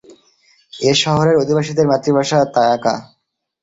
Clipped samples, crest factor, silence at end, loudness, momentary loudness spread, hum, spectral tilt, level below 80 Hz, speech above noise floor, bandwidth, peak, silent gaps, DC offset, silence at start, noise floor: under 0.1%; 14 dB; 0.6 s; -15 LUFS; 6 LU; none; -5 dB/octave; -52 dBFS; 41 dB; 8 kHz; -2 dBFS; none; under 0.1%; 0.75 s; -55 dBFS